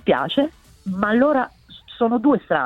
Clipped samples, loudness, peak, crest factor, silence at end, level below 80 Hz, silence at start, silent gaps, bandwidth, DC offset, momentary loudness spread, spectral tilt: under 0.1%; -20 LUFS; -4 dBFS; 16 dB; 0 s; -54 dBFS; 0.05 s; none; 7.6 kHz; under 0.1%; 12 LU; -7.5 dB/octave